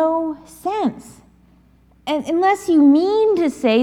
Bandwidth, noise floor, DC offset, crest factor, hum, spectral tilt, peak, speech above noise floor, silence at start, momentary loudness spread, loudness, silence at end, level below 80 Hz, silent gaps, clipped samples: 13.5 kHz; -52 dBFS; under 0.1%; 14 dB; none; -5 dB/octave; -4 dBFS; 36 dB; 0 s; 13 LU; -17 LUFS; 0 s; -56 dBFS; none; under 0.1%